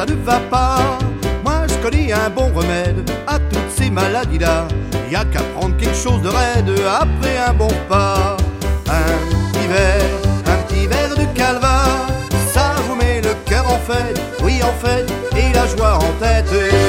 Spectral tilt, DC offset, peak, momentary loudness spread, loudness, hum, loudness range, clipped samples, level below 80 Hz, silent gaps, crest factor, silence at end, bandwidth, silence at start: -5.5 dB/octave; under 0.1%; 0 dBFS; 5 LU; -16 LUFS; none; 2 LU; under 0.1%; -20 dBFS; none; 14 dB; 0 s; 16.5 kHz; 0 s